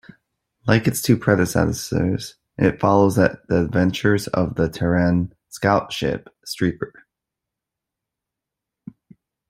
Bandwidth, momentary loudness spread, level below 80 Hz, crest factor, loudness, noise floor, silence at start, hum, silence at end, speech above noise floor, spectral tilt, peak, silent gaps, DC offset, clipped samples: 16 kHz; 12 LU; -48 dBFS; 20 dB; -20 LUFS; -85 dBFS; 0.65 s; none; 2.6 s; 65 dB; -6 dB/octave; -2 dBFS; none; under 0.1%; under 0.1%